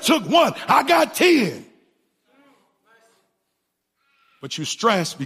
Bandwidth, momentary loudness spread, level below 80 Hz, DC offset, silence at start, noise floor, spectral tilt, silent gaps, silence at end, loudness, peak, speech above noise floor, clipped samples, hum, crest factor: 15.5 kHz; 15 LU; -72 dBFS; under 0.1%; 0 s; -76 dBFS; -3.5 dB/octave; none; 0 s; -18 LUFS; -4 dBFS; 57 dB; under 0.1%; none; 18 dB